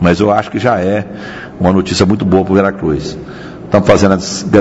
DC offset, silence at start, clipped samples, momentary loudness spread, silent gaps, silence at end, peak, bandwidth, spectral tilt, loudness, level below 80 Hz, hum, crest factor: under 0.1%; 0 s; 0.5%; 16 LU; none; 0 s; 0 dBFS; 8 kHz; -6 dB/octave; -12 LUFS; -36 dBFS; none; 12 dB